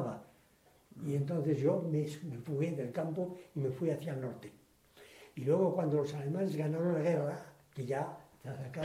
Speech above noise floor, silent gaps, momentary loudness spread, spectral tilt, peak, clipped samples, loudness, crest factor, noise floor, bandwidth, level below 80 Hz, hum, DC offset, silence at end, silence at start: 32 dB; none; 16 LU; -8.5 dB/octave; -18 dBFS; under 0.1%; -36 LUFS; 16 dB; -67 dBFS; 15.5 kHz; -74 dBFS; none; under 0.1%; 0 s; 0 s